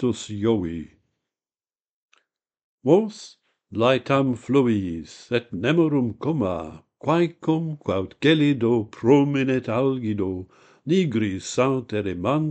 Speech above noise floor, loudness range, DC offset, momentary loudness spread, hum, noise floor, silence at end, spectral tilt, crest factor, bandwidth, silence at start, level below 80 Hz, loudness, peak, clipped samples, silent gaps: over 68 dB; 5 LU; under 0.1%; 12 LU; none; under -90 dBFS; 0 s; -6.5 dB/octave; 18 dB; 8.8 kHz; 0 s; -56 dBFS; -23 LUFS; -4 dBFS; under 0.1%; 1.89-2.09 s, 2.64-2.78 s